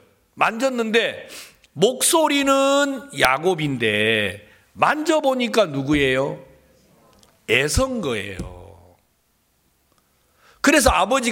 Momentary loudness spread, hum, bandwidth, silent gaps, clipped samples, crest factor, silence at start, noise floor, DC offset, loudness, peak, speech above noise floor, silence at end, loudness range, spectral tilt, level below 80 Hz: 18 LU; none; 17 kHz; none; under 0.1%; 20 dB; 0.35 s; -65 dBFS; under 0.1%; -19 LUFS; 0 dBFS; 46 dB; 0 s; 7 LU; -3.5 dB/octave; -42 dBFS